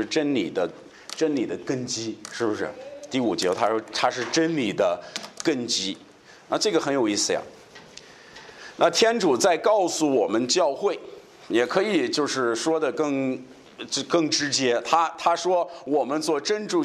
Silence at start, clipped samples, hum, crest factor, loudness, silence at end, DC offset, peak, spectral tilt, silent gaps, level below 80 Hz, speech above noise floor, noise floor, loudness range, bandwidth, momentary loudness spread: 0 s; under 0.1%; none; 18 dB; -24 LUFS; 0 s; under 0.1%; -6 dBFS; -3 dB/octave; none; -70 dBFS; 23 dB; -47 dBFS; 4 LU; 14 kHz; 14 LU